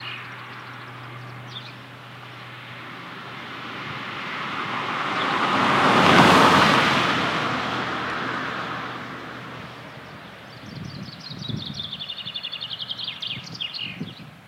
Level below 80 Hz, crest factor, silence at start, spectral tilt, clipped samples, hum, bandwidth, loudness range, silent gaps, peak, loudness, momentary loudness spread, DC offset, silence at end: -60 dBFS; 24 dB; 0 s; -4.5 dB/octave; under 0.1%; none; 16 kHz; 17 LU; none; -2 dBFS; -22 LUFS; 22 LU; under 0.1%; 0 s